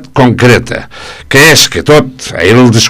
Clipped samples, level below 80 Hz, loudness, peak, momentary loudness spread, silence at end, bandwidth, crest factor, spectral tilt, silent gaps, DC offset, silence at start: 5%; -32 dBFS; -5 LUFS; 0 dBFS; 16 LU; 0 s; over 20 kHz; 6 dB; -4 dB/octave; none; under 0.1%; 0 s